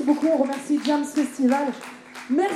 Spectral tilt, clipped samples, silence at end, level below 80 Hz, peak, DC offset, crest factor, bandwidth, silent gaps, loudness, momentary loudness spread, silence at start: -4 dB/octave; under 0.1%; 0 s; -74 dBFS; -8 dBFS; under 0.1%; 14 dB; 13 kHz; none; -23 LUFS; 15 LU; 0 s